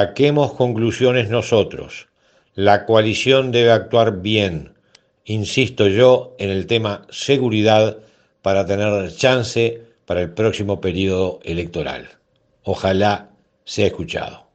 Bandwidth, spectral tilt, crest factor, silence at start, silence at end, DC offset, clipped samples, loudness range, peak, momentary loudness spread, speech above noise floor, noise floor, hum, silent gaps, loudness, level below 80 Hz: 8.8 kHz; -5.5 dB/octave; 18 dB; 0 s; 0.2 s; under 0.1%; under 0.1%; 5 LU; 0 dBFS; 12 LU; 39 dB; -56 dBFS; none; none; -18 LUFS; -52 dBFS